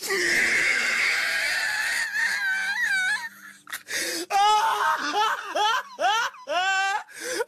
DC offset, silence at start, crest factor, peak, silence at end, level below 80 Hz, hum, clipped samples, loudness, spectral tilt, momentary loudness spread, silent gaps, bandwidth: under 0.1%; 0 s; 14 dB; -12 dBFS; 0 s; -66 dBFS; none; under 0.1%; -23 LUFS; 0.5 dB/octave; 8 LU; none; 13.5 kHz